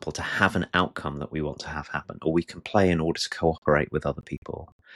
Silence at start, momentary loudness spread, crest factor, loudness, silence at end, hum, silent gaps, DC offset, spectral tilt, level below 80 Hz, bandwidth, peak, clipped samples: 0 s; 12 LU; 20 dB; -27 LUFS; 0 s; none; 3.58-3.62 s, 4.38-4.42 s, 4.72-4.79 s; under 0.1%; -5.5 dB/octave; -46 dBFS; 12.5 kHz; -6 dBFS; under 0.1%